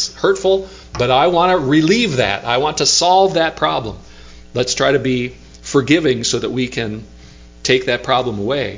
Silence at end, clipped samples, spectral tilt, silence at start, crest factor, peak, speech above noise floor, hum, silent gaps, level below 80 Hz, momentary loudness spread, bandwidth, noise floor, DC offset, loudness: 0 s; under 0.1%; -4 dB/octave; 0 s; 16 dB; 0 dBFS; 24 dB; none; none; -42 dBFS; 12 LU; 7.8 kHz; -40 dBFS; under 0.1%; -15 LUFS